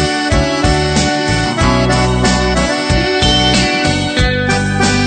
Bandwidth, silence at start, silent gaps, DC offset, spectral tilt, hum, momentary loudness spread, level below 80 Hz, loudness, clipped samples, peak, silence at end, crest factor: 9.4 kHz; 0 s; none; under 0.1%; -4.5 dB/octave; none; 3 LU; -22 dBFS; -12 LUFS; under 0.1%; 0 dBFS; 0 s; 12 dB